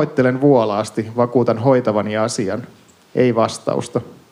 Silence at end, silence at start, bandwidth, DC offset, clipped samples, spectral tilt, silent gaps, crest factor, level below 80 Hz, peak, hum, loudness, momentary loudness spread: 0.2 s; 0 s; 15 kHz; under 0.1%; under 0.1%; -6.5 dB/octave; none; 16 dB; -68 dBFS; -2 dBFS; none; -18 LUFS; 10 LU